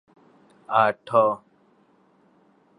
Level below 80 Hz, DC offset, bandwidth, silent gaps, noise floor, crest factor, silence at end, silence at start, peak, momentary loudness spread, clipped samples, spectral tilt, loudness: -74 dBFS; under 0.1%; 10.5 kHz; none; -61 dBFS; 22 dB; 1.45 s; 0.7 s; -4 dBFS; 5 LU; under 0.1%; -6.5 dB/octave; -22 LUFS